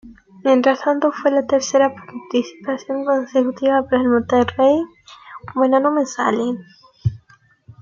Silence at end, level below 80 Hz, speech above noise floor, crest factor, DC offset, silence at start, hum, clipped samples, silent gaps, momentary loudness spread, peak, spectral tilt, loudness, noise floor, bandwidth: 0.65 s; -56 dBFS; 36 dB; 16 dB; under 0.1%; 0.05 s; none; under 0.1%; none; 11 LU; -2 dBFS; -5.5 dB/octave; -18 LUFS; -53 dBFS; 7.4 kHz